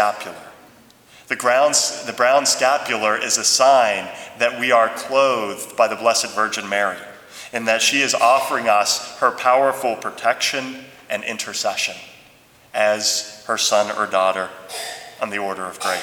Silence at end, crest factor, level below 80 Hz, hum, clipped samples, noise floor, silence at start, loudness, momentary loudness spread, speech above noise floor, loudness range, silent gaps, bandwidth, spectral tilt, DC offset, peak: 0 s; 18 dB; -70 dBFS; none; under 0.1%; -50 dBFS; 0 s; -18 LUFS; 14 LU; 31 dB; 5 LU; none; 19.5 kHz; -0.5 dB/octave; under 0.1%; -2 dBFS